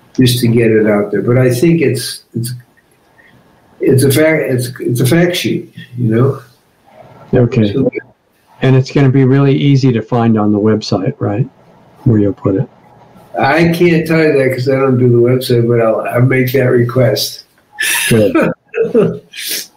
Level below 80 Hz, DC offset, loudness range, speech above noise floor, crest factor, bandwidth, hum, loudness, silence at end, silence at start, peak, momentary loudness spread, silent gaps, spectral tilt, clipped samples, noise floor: -46 dBFS; under 0.1%; 4 LU; 40 dB; 12 dB; 16 kHz; none; -12 LUFS; 0.1 s; 0.2 s; 0 dBFS; 9 LU; none; -6 dB/octave; under 0.1%; -50 dBFS